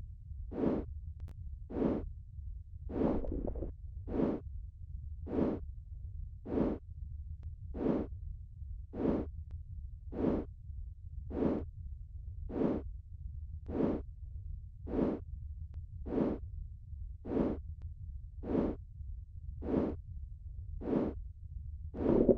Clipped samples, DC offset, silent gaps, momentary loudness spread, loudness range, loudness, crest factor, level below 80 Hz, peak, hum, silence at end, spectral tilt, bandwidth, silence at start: under 0.1%; under 0.1%; none; 13 LU; 2 LU; -39 LUFS; 26 dB; -46 dBFS; -12 dBFS; none; 0 s; -11 dB/octave; 5.4 kHz; 0 s